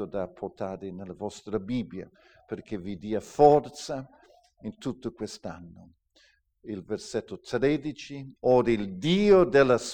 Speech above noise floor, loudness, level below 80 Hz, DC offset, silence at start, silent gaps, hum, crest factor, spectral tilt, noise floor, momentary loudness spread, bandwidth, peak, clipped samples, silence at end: 37 dB; -27 LUFS; -54 dBFS; under 0.1%; 0 s; none; none; 22 dB; -6 dB/octave; -64 dBFS; 20 LU; 9.8 kHz; -6 dBFS; under 0.1%; 0 s